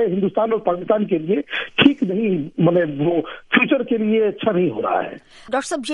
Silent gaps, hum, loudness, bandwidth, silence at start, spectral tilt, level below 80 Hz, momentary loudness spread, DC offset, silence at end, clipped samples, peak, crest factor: none; none; -19 LUFS; 11.5 kHz; 0 s; -6 dB/octave; -58 dBFS; 8 LU; under 0.1%; 0 s; under 0.1%; 0 dBFS; 18 dB